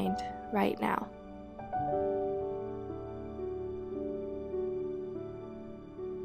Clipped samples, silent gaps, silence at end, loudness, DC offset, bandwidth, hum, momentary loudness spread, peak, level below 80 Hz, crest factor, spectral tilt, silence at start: under 0.1%; none; 0 s; -37 LUFS; under 0.1%; 15 kHz; none; 13 LU; -16 dBFS; -56 dBFS; 20 dB; -7.5 dB/octave; 0 s